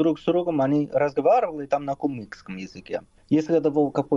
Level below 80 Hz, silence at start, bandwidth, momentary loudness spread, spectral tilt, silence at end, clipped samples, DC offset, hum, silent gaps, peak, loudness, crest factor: -60 dBFS; 0 s; 7.4 kHz; 16 LU; -8 dB/octave; 0 s; under 0.1%; under 0.1%; none; none; -10 dBFS; -23 LUFS; 14 dB